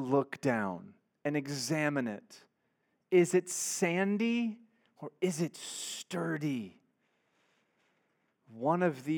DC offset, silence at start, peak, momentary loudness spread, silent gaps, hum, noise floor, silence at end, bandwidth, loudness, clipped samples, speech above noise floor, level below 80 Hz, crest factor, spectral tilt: under 0.1%; 0 s; -14 dBFS; 10 LU; none; none; -78 dBFS; 0 s; 18.5 kHz; -33 LUFS; under 0.1%; 46 dB; -90 dBFS; 20 dB; -5 dB/octave